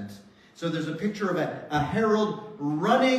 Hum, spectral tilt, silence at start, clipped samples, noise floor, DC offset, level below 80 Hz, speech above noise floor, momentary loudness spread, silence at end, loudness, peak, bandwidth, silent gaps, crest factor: none; -6 dB/octave; 0 s; under 0.1%; -49 dBFS; under 0.1%; -58 dBFS; 23 dB; 9 LU; 0 s; -27 LUFS; -8 dBFS; 14 kHz; none; 18 dB